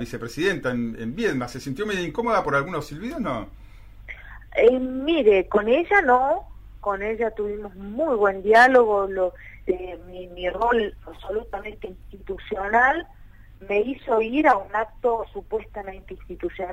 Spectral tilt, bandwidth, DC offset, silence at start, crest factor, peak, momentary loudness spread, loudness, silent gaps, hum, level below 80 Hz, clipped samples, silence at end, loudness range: -5.5 dB/octave; 15 kHz; under 0.1%; 0 s; 18 dB; -6 dBFS; 18 LU; -22 LUFS; none; none; -44 dBFS; under 0.1%; 0 s; 6 LU